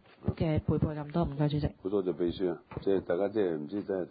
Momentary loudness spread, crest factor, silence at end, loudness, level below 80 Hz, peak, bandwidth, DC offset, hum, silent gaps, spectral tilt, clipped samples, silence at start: 5 LU; 16 dB; 0 s; -32 LUFS; -48 dBFS; -16 dBFS; 5 kHz; under 0.1%; none; none; -12 dB/octave; under 0.1%; 0.2 s